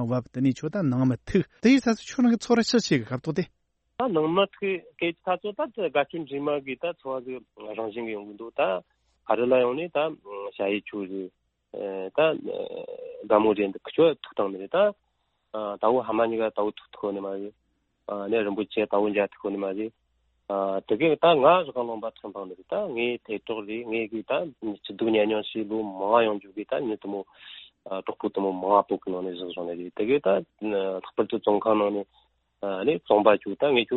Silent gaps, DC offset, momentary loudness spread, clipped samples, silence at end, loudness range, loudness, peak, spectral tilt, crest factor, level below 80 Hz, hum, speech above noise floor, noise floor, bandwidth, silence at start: none; under 0.1%; 14 LU; under 0.1%; 0 s; 5 LU; -26 LUFS; -4 dBFS; -6 dB/octave; 22 dB; -64 dBFS; none; 38 dB; -64 dBFS; 8.2 kHz; 0 s